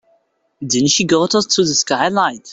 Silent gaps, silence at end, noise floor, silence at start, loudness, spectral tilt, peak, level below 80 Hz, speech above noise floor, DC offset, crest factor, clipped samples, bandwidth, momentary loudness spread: none; 0 s; -61 dBFS; 0.6 s; -15 LUFS; -3 dB/octave; -2 dBFS; -54 dBFS; 45 dB; under 0.1%; 16 dB; under 0.1%; 8.4 kHz; 5 LU